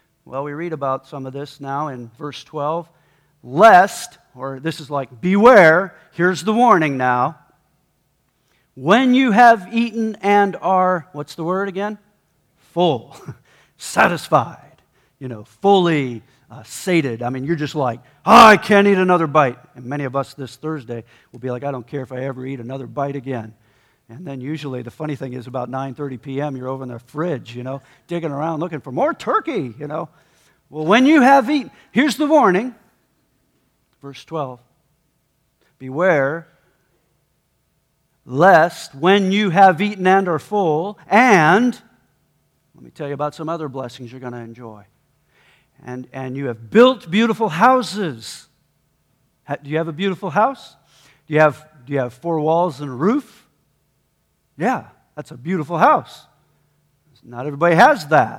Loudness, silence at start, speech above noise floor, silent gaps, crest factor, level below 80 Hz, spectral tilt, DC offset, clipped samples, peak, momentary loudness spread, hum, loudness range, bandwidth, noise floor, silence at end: -17 LUFS; 0.3 s; 49 dB; none; 18 dB; -60 dBFS; -6 dB/octave; under 0.1%; under 0.1%; 0 dBFS; 20 LU; none; 13 LU; 17 kHz; -66 dBFS; 0 s